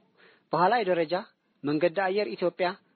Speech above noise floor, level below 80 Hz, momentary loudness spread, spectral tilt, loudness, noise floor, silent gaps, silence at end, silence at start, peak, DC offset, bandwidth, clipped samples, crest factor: 34 dB; -78 dBFS; 8 LU; -3.5 dB/octave; -27 LUFS; -61 dBFS; none; 0.2 s; 0.5 s; -10 dBFS; under 0.1%; 4.6 kHz; under 0.1%; 18 dB